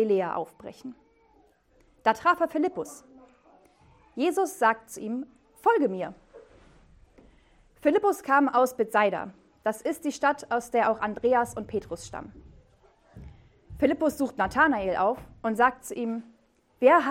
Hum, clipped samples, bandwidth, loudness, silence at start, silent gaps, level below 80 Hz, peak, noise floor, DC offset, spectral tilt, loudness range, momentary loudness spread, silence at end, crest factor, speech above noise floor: none; under 0.1%; 16.5 kHz; -26 LUFS; 0 s; none; -58 dBFS; -6 dBFS; -63 dBFS; under 0.1%; -5 dB/octave; 5 LU; 16 LU; 0 s; 20 dB; 37 dB